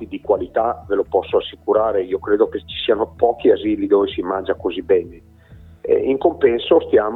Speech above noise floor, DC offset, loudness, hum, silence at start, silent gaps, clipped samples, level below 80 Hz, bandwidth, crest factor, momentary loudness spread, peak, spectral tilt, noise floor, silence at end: 23 dB; under 0.1%; -18 LUFS; none; 0 s; none; under 0.1%; -46 dBFS; 4.2 kHz; 18 dB; 7 LU; -2 dBFS; -8 dB/octave; -41 dBFS; 0 s